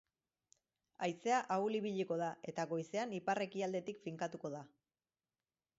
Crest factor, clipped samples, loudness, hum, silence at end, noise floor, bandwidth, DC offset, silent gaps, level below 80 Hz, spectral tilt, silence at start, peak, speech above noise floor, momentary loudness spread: 18 dB; under 0.1%; -40 LUFS; none; 1.1 s; under -90 dBFS; 7.6 kHz; under 0.1%; none; -86 dBFS; -4.5 dB/octave; 1 s; -24 dBFS; over 50 dB; 9 LU